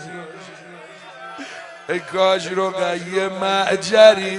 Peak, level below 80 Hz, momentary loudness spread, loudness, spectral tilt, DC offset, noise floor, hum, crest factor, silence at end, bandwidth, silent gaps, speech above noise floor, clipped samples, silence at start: 0 dBFS; -68 dBFS; 27 LU; -18 LUFS; -3.5 dB/octave; under 0.1%; -40 dBFS; none; 20 dB; 0 s; 11.5 kHz; none; 23 dB; under 0.1%; 0 s